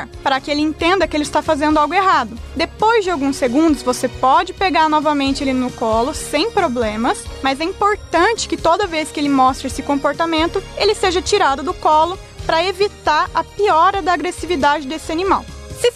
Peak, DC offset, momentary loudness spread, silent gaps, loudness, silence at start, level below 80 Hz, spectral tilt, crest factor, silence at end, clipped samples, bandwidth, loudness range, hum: -4 dBFS; under 0.1%; 6 LU; none; -17 LUFS; 0 s; -36 dBFS; -4 dB/octave; 12 dB; 0 s; under 0.1%; 14 kHz; 2 LU; none